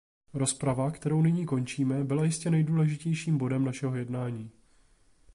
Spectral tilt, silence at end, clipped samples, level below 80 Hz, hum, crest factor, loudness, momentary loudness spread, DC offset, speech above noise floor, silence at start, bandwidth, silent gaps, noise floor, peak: -6.5 dB/octave; 0.85 s; under 0.1%; -62 dBFS; none; 14 dB; -29 LUFS; 8 LU; under 0.1%; 34 dB; 0.35 s; 11.5 kHz; none; -62 dBFS; -16 dBFS